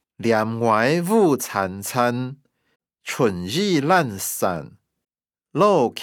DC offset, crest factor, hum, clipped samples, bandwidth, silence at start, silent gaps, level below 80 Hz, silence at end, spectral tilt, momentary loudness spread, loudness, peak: under 0.1%; 18 dB; none; under 0.1%; over 20 kHz; 0.2 s; 2.76-2.80 s; -68 dBFS; 0 s; -5 dB/octave; 12 LU; -21 LUFS; -4 dBFS